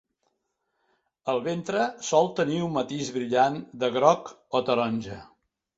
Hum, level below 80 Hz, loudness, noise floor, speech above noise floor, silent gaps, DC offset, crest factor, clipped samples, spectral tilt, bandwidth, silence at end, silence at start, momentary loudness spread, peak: none; -66 dBFS; -26 LUFS; -78 dBFS; 52 dB; none; under 0.1%; 22 dB; under 0.1%; -5 dB/octave; 8 kHz; 0.55 s; 1.25 s; 8 LU; -6 dBFS